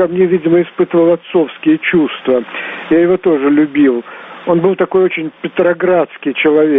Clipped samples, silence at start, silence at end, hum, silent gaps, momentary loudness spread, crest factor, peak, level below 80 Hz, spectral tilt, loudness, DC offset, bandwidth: under 0.1%; 0 s; 0 s; none; none; 8 LU; 12 dB; 0 dBFS; -54 dBFS; -5 dB/octave; -13 LUFS; under 0.1%; 3.9 kHz